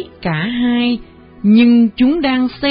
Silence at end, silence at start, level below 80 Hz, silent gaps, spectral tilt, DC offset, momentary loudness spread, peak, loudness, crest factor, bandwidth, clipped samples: 0 s; 0 s; -44 dBFS; none; -11.5 dB/octave; under 0.1%; 10 LU; -2 dBFS; -14 LUFS; 12 dB; 5.2 kHz; under 0.1%